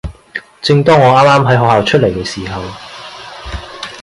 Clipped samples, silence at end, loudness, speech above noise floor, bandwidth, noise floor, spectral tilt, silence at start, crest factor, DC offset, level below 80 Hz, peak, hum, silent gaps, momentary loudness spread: under 0.1%; 0 s; -10 LUFS; 20 dB; 11.5 kHz; -30 dBFS; -6 dB/octave; 0.05 s; 12 dB; under 0.1%; -34 dBFS; 0 dBFS; none; none; 21 LU